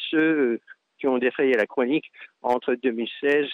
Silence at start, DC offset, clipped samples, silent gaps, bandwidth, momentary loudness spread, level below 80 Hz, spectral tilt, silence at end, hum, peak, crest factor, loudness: 0 s; under 0.1%; under 0.1%; none; 7 kHz; 8 LU; -74 dBFS; -6 dB/octave; 0 s; none; -10 dBFS; 14 dB; -24 LUFS